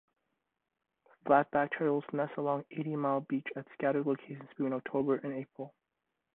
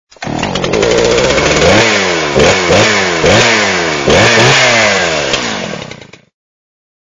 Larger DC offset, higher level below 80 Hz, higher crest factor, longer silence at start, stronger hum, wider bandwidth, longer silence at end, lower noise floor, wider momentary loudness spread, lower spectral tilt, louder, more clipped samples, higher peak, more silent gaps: neither; second, -78 dBFS vs -32 dBFS; first, 22 dB vs 10 dB; first, 1.25 s vs 0.2 s; neither; second, 4 kHz vs 11 kHz; second, 0.65 s vs 1.05 s; first, -86 dBFS vs -31 dBFS; first, 15 LU vs 11 LU; first, -10.5 dB/octave vs -3 dB/octave; second, -33 LUFS vs -9 LUFS; second, under 0.1% vs 0.4%; second, -12 dBFS vs 0 dBFS; neither